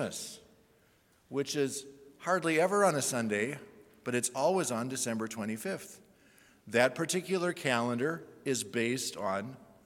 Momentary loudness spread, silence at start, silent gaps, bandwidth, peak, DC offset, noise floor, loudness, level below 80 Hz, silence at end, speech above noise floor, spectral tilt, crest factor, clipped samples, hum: 14 LU; 0 s; none; 18 kHz; -10 dBFS; under 0.1%; -67 dBFS; -32 LUFS; -78 dBFS; 0.2 s; 35 dB; -4 dB/octave; 22 dB; under 0.1%; none